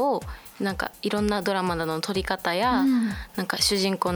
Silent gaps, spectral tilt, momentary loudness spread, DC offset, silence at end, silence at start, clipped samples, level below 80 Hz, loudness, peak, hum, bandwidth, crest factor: none; -4 dB/octave; 9 LU; under 0.1%; 0 s; 0 s; under 0.1%; -44 dBFS; -25 LUFS; -8 dBFS; none; over 20 kHz; 18 dB